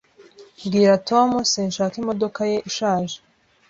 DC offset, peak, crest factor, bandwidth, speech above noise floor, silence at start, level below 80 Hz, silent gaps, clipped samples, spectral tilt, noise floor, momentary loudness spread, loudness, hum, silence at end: under 0.1%; -4 dBFS; 18 dB; 7.8 kHz; 28 dB; 0.2 s; -60 dBFS; none; under 0.1%; -4.5 dB/octave; -48 dBFS; 9 LU; -20 LUFS; none; 0.5 s